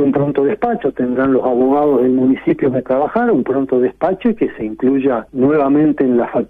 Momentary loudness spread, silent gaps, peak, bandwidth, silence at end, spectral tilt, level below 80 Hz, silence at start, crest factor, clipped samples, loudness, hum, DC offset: 5 LU; none; -4 dBFS; 3.8 kHz; 0.05 s; -10.5 dB/octave; -48 dBFS; 0 s; 10 dB; under 0.1%; -15 LUFS; none; under 0.1%